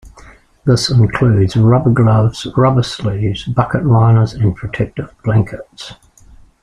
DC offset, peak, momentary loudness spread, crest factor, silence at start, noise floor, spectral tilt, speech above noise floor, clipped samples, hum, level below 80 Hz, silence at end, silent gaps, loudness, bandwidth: under 0.1%; -2 dBFS; 11 LU; 12 dB; 0.05 s; -42 dBFS; -7 dB/octave; 30 dB; under 0.1%; none; -38 dBFS; 0.7 s; none; -14 LUFS; 10 kHz